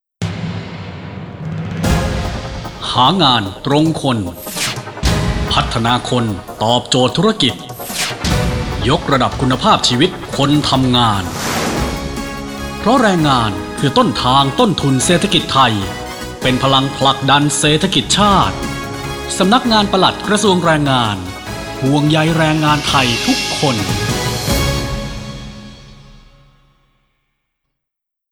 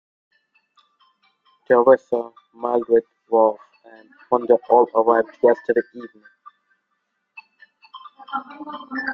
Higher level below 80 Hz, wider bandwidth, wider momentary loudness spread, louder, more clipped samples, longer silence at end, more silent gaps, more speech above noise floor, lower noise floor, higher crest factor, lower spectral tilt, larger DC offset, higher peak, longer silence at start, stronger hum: first, -30 dBFS vs -70 dBFS; first, over 20 kHz vs 5.6 kHz; second, 13 LU vs 21 LU; first, -14 LUFS vs -19 LUFS; neither; first, 2.2 s vs 0 s; neither; first, 66 dB vs 55 dB; first, -80 dBFS vs -74 dBFS; about the same, 16 dB vs 20 dB; second, -4.5 dB/octave vs -7.5 dB/octave; neither; about the same, 0 dBFS vs -2 dBFS; second, 0.2 s vs 1.7 s; neither